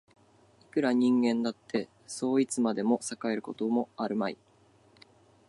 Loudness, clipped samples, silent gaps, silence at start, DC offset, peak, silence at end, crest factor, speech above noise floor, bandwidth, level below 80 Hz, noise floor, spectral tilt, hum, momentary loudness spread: -30 LUFS; under 0.1%; none; 0.75 s; under 0.1%; -14 dBFS; 1.15 s; 16 dB; 33 dB; 11.5 kHz; -78 dBFS; -62 dBFS; -5 dB/octave; none; 10 LU